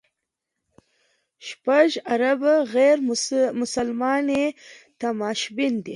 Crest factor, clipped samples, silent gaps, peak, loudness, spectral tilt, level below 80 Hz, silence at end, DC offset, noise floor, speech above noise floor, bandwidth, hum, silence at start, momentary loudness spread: 18 dB; under 0.1%; none; -4 dBFS; -22 LUFS; -3.5 dB/octave; -66 dBFS; 0 s; under 0.1%; -82 dBFS; 60 dB; 11.5 kHz; none; 1.4 s; 10 LU